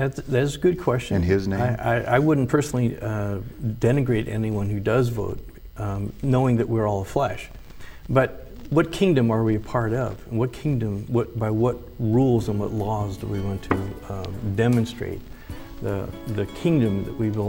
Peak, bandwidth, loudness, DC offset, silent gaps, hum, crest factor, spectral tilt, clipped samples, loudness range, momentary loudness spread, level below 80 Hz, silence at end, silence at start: -4 dBFS; 16.5 kHz; -24 LUFS; under 0.1%; none; none; 18 dB; -7.5 dB/octave; under 0.1%; 4 LU; 12 LU; -42 dBFS; 0 s; 0 s